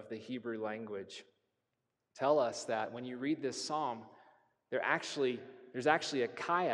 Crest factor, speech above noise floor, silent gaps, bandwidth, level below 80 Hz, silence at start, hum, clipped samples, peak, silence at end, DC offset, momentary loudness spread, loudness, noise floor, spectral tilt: 24 dB; 50 dB; none; 11.5 kHz; -88 dBFS; 0 s; none; under 0.1%; -14 dBFS; 0 s; under 0.1%; 13 LU; -36 LUFS; -86 dBFS; -4 dB/octave